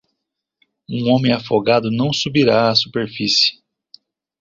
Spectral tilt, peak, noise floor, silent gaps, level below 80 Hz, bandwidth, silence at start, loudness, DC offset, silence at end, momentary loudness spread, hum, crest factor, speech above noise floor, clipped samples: -5 dB/octave; -2 dBFS; -78 dBFS; none; -54 dBFS; 7.6 kHz; 0.9 s; -16 LUFS; under 0.1%; 0.9 s; 8 LU; none; 16 dB; 62 dB; under 0.1%